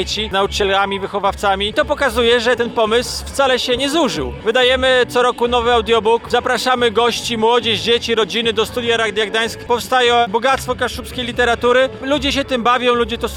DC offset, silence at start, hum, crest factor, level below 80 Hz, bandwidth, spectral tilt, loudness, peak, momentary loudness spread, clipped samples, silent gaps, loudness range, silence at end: 0.1%; 0 s; none; 12 dB; -36 dBFS; 17 kHz; -3.5 dB/octave; -16 LUFS; -2 dBFS; 5 LU; under 0.1%; none; 2 LU; 0 s